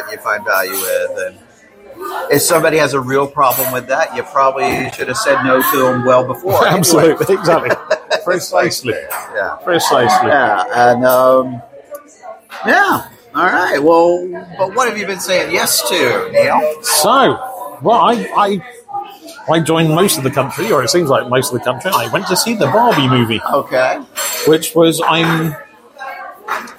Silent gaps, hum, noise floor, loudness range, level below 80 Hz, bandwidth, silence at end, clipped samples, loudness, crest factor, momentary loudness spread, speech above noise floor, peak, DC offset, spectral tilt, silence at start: none; none; -39 dBFS; 2 LU; -54 dBFS; 16.5 kHz; 0.05 s; under 0.1%; -13 LUFS; 14 dB; 13 LU; 26 dB; 0 dBFS; under 0.1%; -4 dB/octave; 0 s